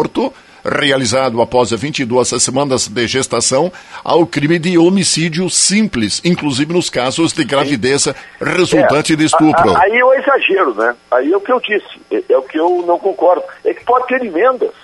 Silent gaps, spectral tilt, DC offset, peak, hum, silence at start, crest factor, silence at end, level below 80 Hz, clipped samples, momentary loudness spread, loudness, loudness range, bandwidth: none; -4 dB/octave; under 0.1%; 0 dBFS; none; 0 s; 14 dB; 0.15 s; -48 dBFS; under 0.1%; 7 LU; -13 LUFS; 3 LU; 11.5 kHz